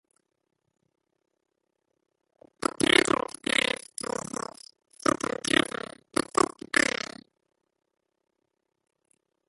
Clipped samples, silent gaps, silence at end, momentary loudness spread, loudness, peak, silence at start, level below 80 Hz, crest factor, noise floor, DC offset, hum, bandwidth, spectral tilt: under 0.1%; none; 2.65 s; 14 LU; -27 LUFS; -4 dBFS; 2.8 s; -64 dBFS; 26 dB; -80 dBFS; under 0.1%; none; 12 kHz; -2 dB/octave